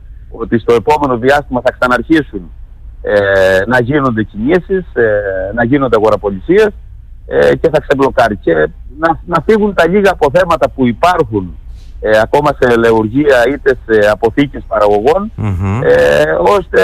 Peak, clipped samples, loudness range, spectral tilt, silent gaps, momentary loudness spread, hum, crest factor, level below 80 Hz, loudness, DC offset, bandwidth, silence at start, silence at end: 0 dBFS; under 0.1%; 2 LU; -6.5 dB/octave; none; 7 LU; none; 10 dB; -30 dBFS; -11 LUFS; under 0.1%; 15 kHz; 0.05 s; 0 s